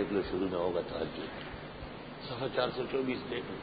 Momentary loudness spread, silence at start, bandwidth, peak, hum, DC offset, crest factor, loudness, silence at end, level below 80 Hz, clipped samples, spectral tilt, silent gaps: 11 LU; 0 s; 4.9 kHz; -16 dBFS; none; under 0.1%; 20 dB; -36 LUFS; 0 s; -56 dBFS; under 0.1%; -4 dB/octave; none